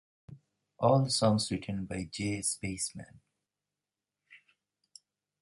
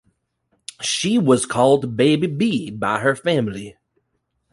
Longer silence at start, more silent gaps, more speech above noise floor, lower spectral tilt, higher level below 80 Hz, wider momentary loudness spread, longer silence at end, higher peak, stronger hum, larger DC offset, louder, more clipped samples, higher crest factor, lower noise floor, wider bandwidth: second, 0.3 s vs 0.8 s; neither; first, over 59 dB vs 53 dB; about the same, -4.5 dB/octave vs -5 dB/octave; about the same, -60 dBFS vs -56 dBFS; second, 11 LU vs 16 LU; first, 1.05 s vs 0.8 s; second, -12 dBFS vs -2 dBFS; first, 50 Hz at -60 dBFS vs none; neither; second, -31 LUFS vs -19 LUFS; neither; about the same, 22 dB vs 18 dB; first, under -90 dBFS vs -72 dBFS; about the same, 11.5 kHz vs 11.5 kHz